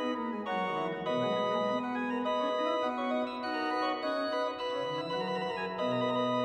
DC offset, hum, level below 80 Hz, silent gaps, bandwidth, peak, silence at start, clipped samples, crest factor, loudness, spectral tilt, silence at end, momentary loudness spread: under 0.1%; none; -74 dBFS; none; 9.4 kHz; -20 dBFS; 0 s; under 0.1%; 14 dB; -32 LUFS; -5.5 dB/octave; 0 s; 4 LU